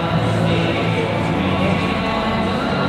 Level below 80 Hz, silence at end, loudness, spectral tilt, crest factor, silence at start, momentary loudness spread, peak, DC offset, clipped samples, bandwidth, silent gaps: -38 dBFS; 0 s; -18 LUFS; -6.5 dB/octave; 14 dB; 0 s; 2 LU; -4 dBFS; under 0.1%; under 0.1%; 12.5 kHz; none